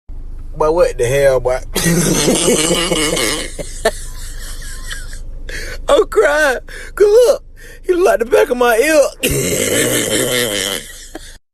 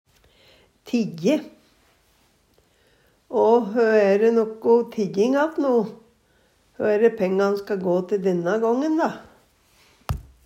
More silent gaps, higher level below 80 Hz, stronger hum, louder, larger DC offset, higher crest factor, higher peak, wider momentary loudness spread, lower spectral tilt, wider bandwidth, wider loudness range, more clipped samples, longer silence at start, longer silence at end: neither; first, -28 dBFS vs -50 dBFS; neither; first, -14 LUFS vs -21 LUFS; neither; about the same, 14 dB vs 16 dB; first, 0 dBFS vs -6 dBFS; first, 18 LU vs 9 LU; second, -3 dB/octave vs -7 dB/octave; about the same, 13.5 kHz vs 13.5 kHz; about the same, 5 LU vs 5 LU; neither; second, 0.1 s vs 0.85 s; about the same, 0.15 s vs 0.25 s